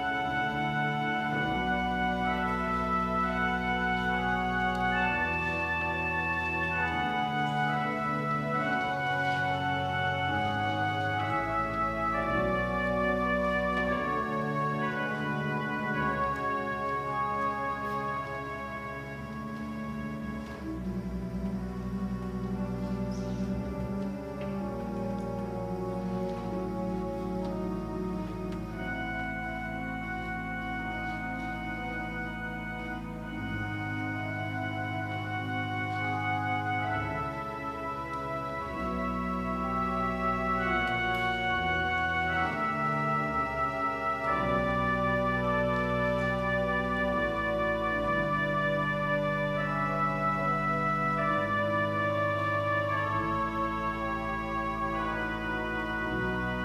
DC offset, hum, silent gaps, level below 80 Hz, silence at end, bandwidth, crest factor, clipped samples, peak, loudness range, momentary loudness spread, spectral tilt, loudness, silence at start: under 0.1%; none; none; -46 dBFS; 0 s; 15.5 kHz; 14 dB; under 0.1%; -16 dBFS; 6 LU; 7 LU; -6.5 dB/octave; -31 LUFS; 0 s